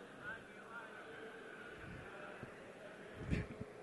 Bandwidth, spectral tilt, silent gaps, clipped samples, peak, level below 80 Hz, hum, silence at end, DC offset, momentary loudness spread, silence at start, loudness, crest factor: 11.5 kHz; -6.5 dB/octave; none; under 0.1%; -24 dBFS; -58 dBFS; none; 0 s; under 0.1%; 10 LU; 0 s; -50 LUFS; 26 dB